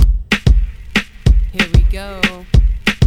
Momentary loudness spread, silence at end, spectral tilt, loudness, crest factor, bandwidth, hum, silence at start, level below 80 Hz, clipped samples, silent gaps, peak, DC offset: 5 LU; 0 s; -5.5 dB/octave; -16 LUFS; 12 dB; 13 kHz; none; 0 s; -14 dBFS; under 0.1%; none; 0 dBFS; under 0.1%